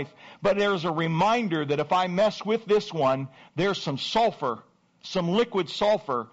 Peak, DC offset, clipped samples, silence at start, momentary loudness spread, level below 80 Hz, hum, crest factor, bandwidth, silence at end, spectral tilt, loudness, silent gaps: -14 dBFS; under 0.1%; under 0.1%; 0 s; 8 LU; -62 dBFS; none; 12 dB; 8 kHz; 0.05 s; -4 dB/octave; -25 LUFS; none